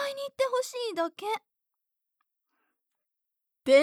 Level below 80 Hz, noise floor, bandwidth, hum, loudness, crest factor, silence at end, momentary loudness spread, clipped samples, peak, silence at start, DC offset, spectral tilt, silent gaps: -80 dBFS; -85 dBFS; 15 kHz; none; -30 LUFS; 22 dB; 0 s; 8 LU; under 0.1%; -8 dBFS; 0 s; under 0.1%; -2 dB/octave; none